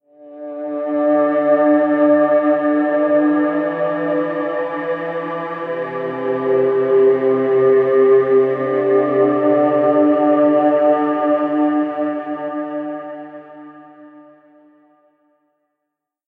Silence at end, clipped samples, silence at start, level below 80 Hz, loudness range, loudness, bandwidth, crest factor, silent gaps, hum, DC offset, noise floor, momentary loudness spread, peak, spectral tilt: 2.05 s; under 0.1%; 0.2 s; -70 dBFS; 9 LU; -16 LUFS; 4.1 kHz; 12 dB; none; none; under 0.1%; -79 dBFS; 11 LU; -4 dBFS; -9.5 dB/octave